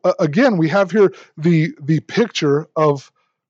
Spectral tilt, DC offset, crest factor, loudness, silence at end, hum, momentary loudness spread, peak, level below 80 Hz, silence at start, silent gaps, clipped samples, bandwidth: -7 dB/octave; under 0.1%; 14 dB; -17 LUFS; 0.5 s; none; 5 LU; -2 dBFS; -74 dBFS; 0.05 s; none; under 0.1%; 7.6 kHz